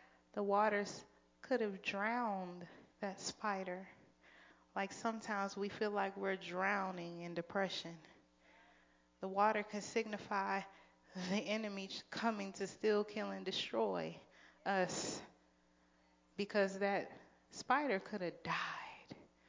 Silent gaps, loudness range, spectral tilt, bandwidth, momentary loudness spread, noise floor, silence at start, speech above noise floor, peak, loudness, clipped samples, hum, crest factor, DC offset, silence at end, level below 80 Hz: none; 3 LU; -4 dB/octave; 7.6 kHz; 15 LU; -73 dBFS; 0.35 s; 33 dB; -20 dBFS; -40 LUFS; under 0.1%; none; 20 dB; under 0.1%; 0.25 s; -80 dBFS